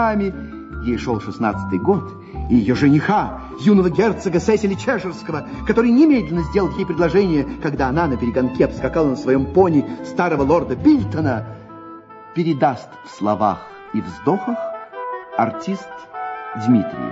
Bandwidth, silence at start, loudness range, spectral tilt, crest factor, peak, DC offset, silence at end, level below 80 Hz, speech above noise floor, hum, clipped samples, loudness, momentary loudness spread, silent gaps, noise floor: 8 kHz; 0 s; 5 LU; -7.5 dB/octave; 16 dB; -2 dBFS; under 0.1%; 0 s; -38 dBFS; 20 dB; none; under 0.1%; -19 LUFS; 14 LU; none; -38 dBFS